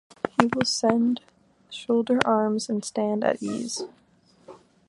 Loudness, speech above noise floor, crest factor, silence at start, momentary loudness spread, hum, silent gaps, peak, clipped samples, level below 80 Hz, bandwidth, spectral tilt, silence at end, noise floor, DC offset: -25 LUFS; 29 dB; 26 dB; 0.25 s; 11 LU; none; none; 0 dBFS; under 0.1%; -64 dBFS; 11.5 kHz; -4 dB/octave; 0.35 s; -54 dBFS; under 0.1%